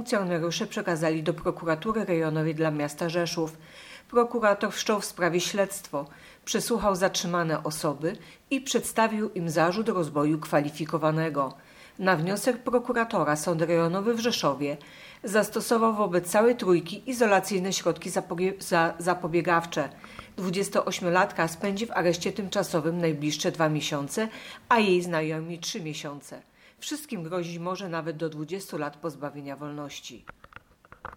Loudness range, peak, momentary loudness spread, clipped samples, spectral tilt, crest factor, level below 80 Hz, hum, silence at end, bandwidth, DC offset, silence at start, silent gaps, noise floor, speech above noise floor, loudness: 8 LU; -8 dBFS; 12 LU; under 0.1%; -4.5 dB/octave; 20 dB; -60 dBFS; none; 0 s; 18.5 kHz; under 0.1%; 0 s; none; -52 dBFS; 25 dB; -27 LUFS